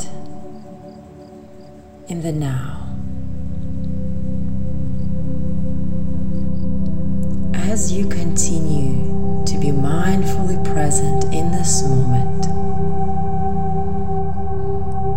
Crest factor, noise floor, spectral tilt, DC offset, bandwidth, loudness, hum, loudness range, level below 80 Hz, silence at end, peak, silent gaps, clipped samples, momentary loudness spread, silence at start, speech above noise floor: 14 dB; -40 dBFS; -6 dB/octave; 20%; 16.5 kHz; -21 LUFS; none; 8 LU; -32 dBFS; 0 s; -2 dBFS; none; under 0.1%; 18 LU; 0 s; 23 dB